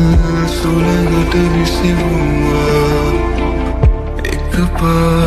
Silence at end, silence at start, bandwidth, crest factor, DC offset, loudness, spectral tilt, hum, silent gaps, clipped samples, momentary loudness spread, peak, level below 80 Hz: 0 s; 0 s; 14 kHz; 12 dB; under 0.1%; -14 LUFS; -6.5 dB/octave; none; none; under 0.1%; 4 LU; 0 dBFS; -18 dBFS